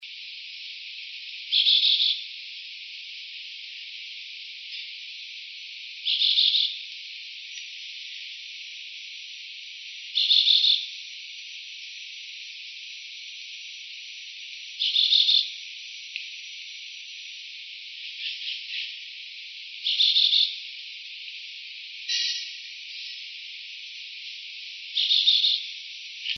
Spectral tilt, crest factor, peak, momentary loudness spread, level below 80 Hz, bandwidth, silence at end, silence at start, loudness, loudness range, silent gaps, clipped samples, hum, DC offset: 10 dB/octave; 22 dB; -8 dBFS; 19 LU; under -90 dBFS; 6.6 kHz; 0 s; 0 s; -23 LUFS; 12 LU; none; under 0.1%; none; under 0.1%